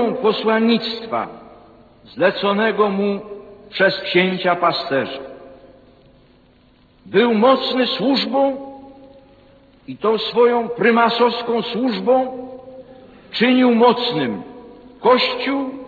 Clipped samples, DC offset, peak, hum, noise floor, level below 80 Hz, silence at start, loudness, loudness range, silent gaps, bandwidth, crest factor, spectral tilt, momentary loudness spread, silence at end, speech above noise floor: under 0.1%; under 0.1%; -2 dBFS; none; -52 dBFS; -58 dBFS; 0 s; -17 LUFS; 3 LU; none; 4.9 kHz; 18 dB; -7 dB/octave; 16 LU; 0 s; 35 dB